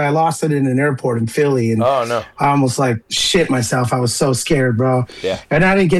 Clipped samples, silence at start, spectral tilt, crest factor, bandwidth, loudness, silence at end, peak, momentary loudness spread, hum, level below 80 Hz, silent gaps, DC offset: under 0.1%; 0 s; -5 dB/octave; 10 dB; 13 kHz; -16 LUFS; 0 s; -6 dBFS; 4 LU; none; -42 dBFS; none; under 0.1%